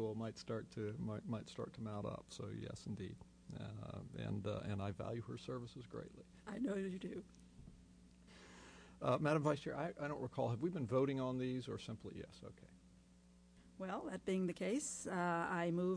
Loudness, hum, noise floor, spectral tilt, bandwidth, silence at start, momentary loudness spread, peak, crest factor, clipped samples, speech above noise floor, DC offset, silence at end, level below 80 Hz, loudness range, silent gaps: -44 LUFS; none; -66 dBFS; -6 dB/octave; 10.5 kHz; 0 s; 20 LU; -24 dBFS; 18 dB; under 0.1%; 24 dB; under 0.1%; 0 s; -68 dBFS; 8 LU; none